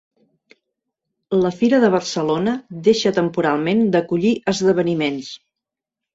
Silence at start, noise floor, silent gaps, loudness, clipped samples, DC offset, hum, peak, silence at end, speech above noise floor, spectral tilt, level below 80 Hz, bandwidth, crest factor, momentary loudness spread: 1.3 s; -86 dBFS; none; -18 LUFS; under 0.1%; under 0.1%; none; -2 dBFS; 0.8 s; 68 dB; -5.5 dB/octave; -58 dBFS; 8 kHz; 16 dB; 7 LU